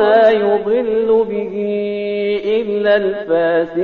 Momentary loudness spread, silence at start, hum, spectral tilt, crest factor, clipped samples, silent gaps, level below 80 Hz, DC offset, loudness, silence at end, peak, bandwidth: 8 LU; 0 s; none; -3.5 dB/octave; 12 dB; under 0.1%; none; -54 dBFS; 0.1%; -16 LUFS; 0 s; -2 dBFS; 5 kHz